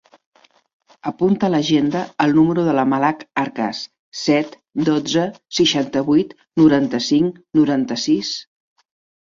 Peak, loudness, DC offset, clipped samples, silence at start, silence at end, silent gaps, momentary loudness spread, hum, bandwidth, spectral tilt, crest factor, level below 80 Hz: -2 dBFS; -18 LUFS; under 0.1%; under 0.1%; 1.05 s; 0.75 s; 3.99-4.12 s; 9 LU; none; 7.6 kHz; -5.5 dB/octave; 16 dB; -58 dBFS